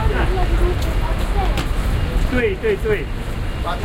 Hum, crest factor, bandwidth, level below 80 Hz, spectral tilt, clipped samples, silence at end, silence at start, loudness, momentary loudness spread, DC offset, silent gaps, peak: none; 14 dB; 16 kHz; -20 dBFS; -6.5 dB/octave; under 0.1%; 0 s; 0 s; -21 LUFS; 6 LU; under 0.1%; none; -4 dBFS